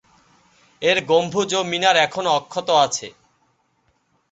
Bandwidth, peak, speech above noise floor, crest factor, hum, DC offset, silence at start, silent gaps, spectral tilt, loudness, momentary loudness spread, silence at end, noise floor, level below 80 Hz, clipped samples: 8.2 kHz; -2 dBFS; 47 dB; 20 dB; none; under 0.1%; 0.8 s; none; -2.5 dB/octave; -19 LUFS; 6 LU; 1.2 s; -66 dBFS; -66 dBFS; under 0.1%